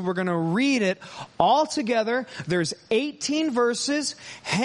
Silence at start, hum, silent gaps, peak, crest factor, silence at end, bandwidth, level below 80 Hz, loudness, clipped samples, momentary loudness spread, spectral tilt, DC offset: 0 s; none; none; -4 dBFS; 20 dB; 0 s; 11.5 kHz; -64 dBFS; -24 LUFS; under 0.1%; 7 LU; -4 dB/octave; under 0.1%